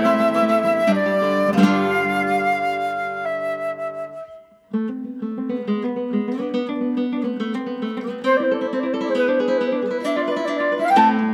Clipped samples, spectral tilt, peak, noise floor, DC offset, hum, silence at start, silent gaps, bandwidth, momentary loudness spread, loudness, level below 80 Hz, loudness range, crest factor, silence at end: under 0.1%; -6.5 dB/octave; -4 dBFS; -43 dBFS; under 0.1%; none; 0 s; none; 14.5 kHz; 10 LU; -21 LUFS; -68 dBFS; 7 LU; 18 dB; 0 s